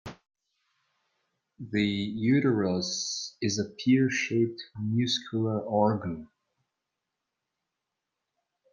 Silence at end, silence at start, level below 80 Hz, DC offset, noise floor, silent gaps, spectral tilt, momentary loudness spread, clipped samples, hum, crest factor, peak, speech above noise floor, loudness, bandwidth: 2.45 s; 0.05 s; -68 dBFS; under 0.1%; -86 dBFS; none; -5 dB/octave; 9 LU; under 0.1%; none; 18 dB; -12 dBFS; 58 dB; -28 LUFS; 9.6 kHz